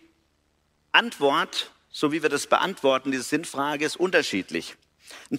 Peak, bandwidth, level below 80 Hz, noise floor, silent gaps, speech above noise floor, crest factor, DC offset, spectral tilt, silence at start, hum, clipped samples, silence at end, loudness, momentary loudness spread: -4 dBFS; 16 kHz; -70 dBFS; -69 dBFS; none; 43 dB; 22 dB; under 0.1%; -3 dB/octave; 0.95 s; none; under 0.1%; 0 s; -24 LUFS; 11 LU